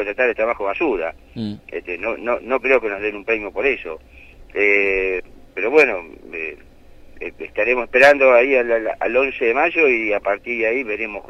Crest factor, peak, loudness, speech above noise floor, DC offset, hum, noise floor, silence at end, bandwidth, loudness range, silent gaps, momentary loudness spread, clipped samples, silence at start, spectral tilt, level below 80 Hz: 18 dB; -2 dBFS; -18 LUFS; 24 dB; under 0.1%; none; -43 dBFS; 0.1 s; 12 kHz; 6 LU; none; 17 LU; under 0.1%; 0 s; -5 dB/octave; -46 dBFS